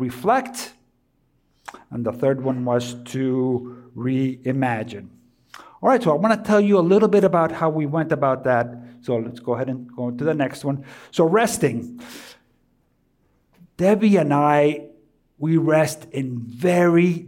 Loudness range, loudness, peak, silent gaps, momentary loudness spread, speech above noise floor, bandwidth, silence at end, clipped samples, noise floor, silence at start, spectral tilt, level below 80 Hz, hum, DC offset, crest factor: 6 LU; -20 LUFS; -6 dBFS; none; 15 LU; 45 dB; 17 kHz; 0 s; under 0.1%; -65 dBFS; 0 s; -6.5 dB/octave; -62 dBFS; none; under 0.1%; 14 dB